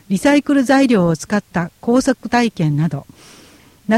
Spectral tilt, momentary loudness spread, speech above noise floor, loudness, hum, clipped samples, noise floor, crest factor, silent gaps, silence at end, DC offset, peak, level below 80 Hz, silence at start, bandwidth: -6 dB/octave; 9 LU; 30 dB; -16 LUFS; none; under 0.1%; -46 dBFS; 14 dB; none; 0 s; under 0.1%; -2 dBFS; -48 dBFS; 0.1 s; 14.5 kHz